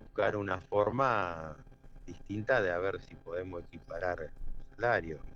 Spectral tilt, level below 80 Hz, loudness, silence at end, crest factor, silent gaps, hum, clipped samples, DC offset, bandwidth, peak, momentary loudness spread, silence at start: -7 dB/octave; -50 dBFS; -34 LUFS; 0 s; 20 dB; none; none; under 0.1%; under 0.1%; 7.2 kHz; -14 dBFS; 18 LU; 0 s